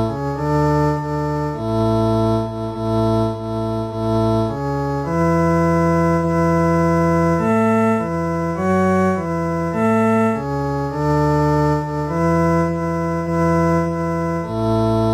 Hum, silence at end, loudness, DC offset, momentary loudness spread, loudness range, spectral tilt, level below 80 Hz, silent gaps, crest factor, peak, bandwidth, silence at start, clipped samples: none; 0 s; -18 LUFS; under 0.1%; 6 LU; 3 LU; -8 dB/octave; -38 dBFS; none; 12 dB; -6 dBFS; 14 kHz; 0 s; under 0.1%